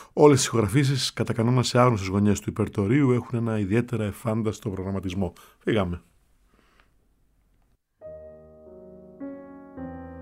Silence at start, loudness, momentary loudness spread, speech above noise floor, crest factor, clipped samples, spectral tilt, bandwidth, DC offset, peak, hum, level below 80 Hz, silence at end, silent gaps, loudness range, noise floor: 0 s; -24 LUFS; 20 LU; 43 dB; 22 dB; under 0.1%; -6 dB/octave; 16 kHz; under 0.1%; -4 dBFS; none; -54 dBFS; 0 s; none; 21 LU; -66 dBFS